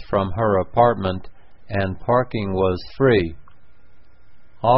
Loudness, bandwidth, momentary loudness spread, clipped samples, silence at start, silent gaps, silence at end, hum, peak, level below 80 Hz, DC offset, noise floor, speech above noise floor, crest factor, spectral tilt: -21 LUFS; 5.8 kHz; 9 LU; under 0.1%; 0 s; none; 0 s; none; -2 dBFS; -40 dBFS; 1%; -52 dBFS; 32 dB; 18 dB; -11.5 dB/octave